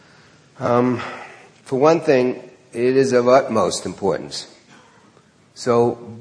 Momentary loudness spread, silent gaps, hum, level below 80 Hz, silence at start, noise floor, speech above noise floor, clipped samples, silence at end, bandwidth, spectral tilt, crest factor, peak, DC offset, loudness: 17 LU; none; none; -62 dBFS; 0.6 s; -53 dBFS; 35 dB; under 0.1%; 0 s; 10.5 kHz; -5.5 dB/octave; 18 dB; 0 dBFS; under 0.1%; -18 LUFS